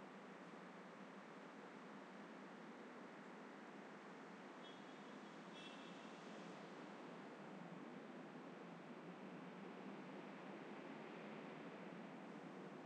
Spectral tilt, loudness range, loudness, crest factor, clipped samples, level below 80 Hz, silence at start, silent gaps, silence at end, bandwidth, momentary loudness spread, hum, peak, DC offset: -5.5 dB/octave; 2 LU; -57 LUFS; 12 dB; under 0.1%; under -90 dBFS; 0 s; none; 0 s; 9.4 kHz; 3 LU; none; -44 dBFS; under 0.1%